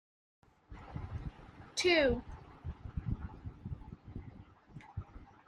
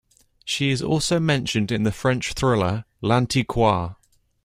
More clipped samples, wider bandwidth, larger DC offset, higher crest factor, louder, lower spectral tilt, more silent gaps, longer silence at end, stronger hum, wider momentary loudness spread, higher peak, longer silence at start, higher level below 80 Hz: neither; second, 11.5 kHz vs 15.5 kHz; neither; about the same, 22 dB vs 18 dB; second, -36 LUFS vs -22 LUFS; about the same, -4.5 dB/octave vs -5 dB/octave; neither; second, 0.15 s vs 0.5 s; neither; first, 25 LU vs 6 LU; second, -16 dBFS vs -6 dBFS; first, 0.7 s vs 0.45 s; second, -50 dBFS vs -44 dBFS